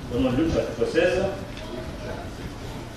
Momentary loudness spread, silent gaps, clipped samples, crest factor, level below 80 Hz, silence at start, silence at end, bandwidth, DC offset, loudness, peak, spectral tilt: 14 LU; none; under 0.1%; 18 dB; -40 dBFS; 0 s; 0 s; 13.5 kHz; under 0.1%; -26 LUFS; -8 dBFS; -6 dB/octave